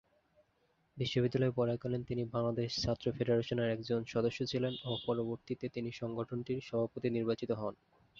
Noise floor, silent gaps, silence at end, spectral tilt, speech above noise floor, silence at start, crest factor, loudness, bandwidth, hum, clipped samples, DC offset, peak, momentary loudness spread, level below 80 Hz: -75 dBFS; none; 0.45 s; -6 dB/octave; 40 dB; 0.95 s; 16 dB; -36 LUFS; 7.4 kHz; none; under 0.1%; under 0.1%; -20 dBFS; 7 LU; -62 dBFS